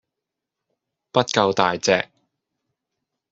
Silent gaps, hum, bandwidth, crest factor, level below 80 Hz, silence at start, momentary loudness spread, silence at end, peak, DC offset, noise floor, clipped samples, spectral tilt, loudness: none; none; 8 kHz; 22 dB; -64 dBFS; 1.15 s; 5 LU; 1.25 s; -2 dBFS; under 0.1%; -84 dBFS; under 0.1%; -2.5 dB/octave; -20 LUFS